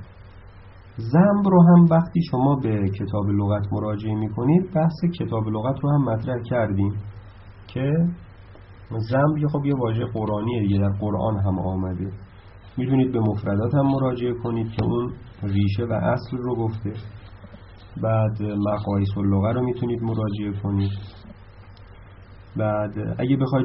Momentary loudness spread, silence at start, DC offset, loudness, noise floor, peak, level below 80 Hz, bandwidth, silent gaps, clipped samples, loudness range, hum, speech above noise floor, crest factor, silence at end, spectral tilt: 12 LU; 0 s; under 0.1%; -22 LUFS; -45 dBFS; -6 dBFS; -48 dBFS; 5.8 kHz; none; under 0.1%; 7 LU; none; 23 dB; 16 dB; 0 s; -8.5 dB/octave